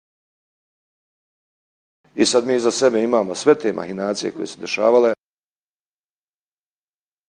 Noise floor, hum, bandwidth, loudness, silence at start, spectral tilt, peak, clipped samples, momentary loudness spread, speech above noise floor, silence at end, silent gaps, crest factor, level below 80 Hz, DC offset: under -90 dBFS; 50 Hz at -55 dBFS; 10.5 kHz; -19 LUFS; 2.15 s; -3.5 dB/octave; -2 dBFS; under 0.1%; 11 LU; over 72 dB; 2.15 s; none; 20 dB; -68 dBFS; under 0.1%